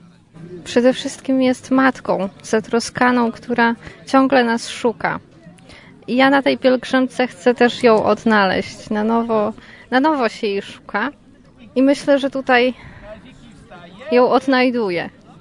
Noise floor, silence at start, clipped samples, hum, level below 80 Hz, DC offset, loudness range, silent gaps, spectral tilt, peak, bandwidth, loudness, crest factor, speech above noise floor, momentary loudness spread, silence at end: -45 dBFS; 0.4 s; under 0.1%; none; -54 dBFS; under 0.1%; 4 LU; none; -4.5 dB/octave; 0 dBFS; 11 kHz; -17 LUFS; 16 dB; 28 dB; 11 LU; 0.3 s